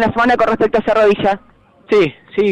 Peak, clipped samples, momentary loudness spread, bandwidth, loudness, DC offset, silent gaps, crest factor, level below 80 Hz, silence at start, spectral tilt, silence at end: -6 dBFS; under 0.1%; 6 LU; 8.8 kHz; -14 LUFS; under 0.1%; none; 8 dB; -42 dBFS; 0 s; -6.5 dB/octave; 0 s